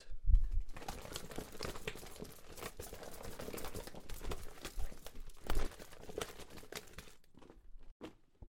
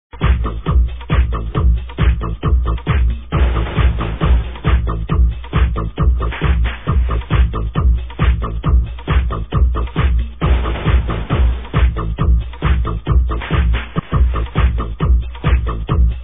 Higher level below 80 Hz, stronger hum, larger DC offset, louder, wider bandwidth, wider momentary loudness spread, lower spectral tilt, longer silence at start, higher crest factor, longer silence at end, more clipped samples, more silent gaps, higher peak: second, -42 dBFS vs -16 dBFS; neither; second, under 0.1% vs 1%; second, -46 LUFS vs -18 LUFS; first, 17 kHz vs 3.8 kHz; first, 12 LU vs 2 LU; second, -4.5 dB/octave vs -11 dB/octave; about the same, 0 s vs 0.1 s; first, 24 dB vs 12 dB; about the same, 0.05 s vs 0 s; neither; first, 7.91-8.00 s vs none; second, -14 dBFS vs -2 dBFS